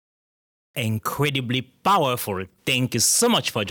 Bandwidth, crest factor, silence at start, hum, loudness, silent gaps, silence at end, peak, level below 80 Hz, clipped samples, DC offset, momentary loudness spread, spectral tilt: over 20 kHz; 14 dB; 0.75 s; none; -22 LUFS; none; 0 s; -10 dBFS; -62 dBFS; under 0.1%; under 0.1%; 11 LU; -3 dB/octave